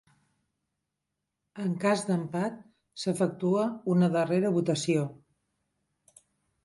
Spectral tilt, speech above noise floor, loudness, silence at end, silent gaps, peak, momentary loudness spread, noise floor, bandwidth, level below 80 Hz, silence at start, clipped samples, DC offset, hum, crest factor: -6.5 dB/octave; 57 dB; -28 LUFS; 1.5 s; none; -12 dBFS; 11 LU; -85 dBFS; 11.5 kHz; -74 dBFS; 1.55 s; under 0.1%; under 0.1%; none; 18 dB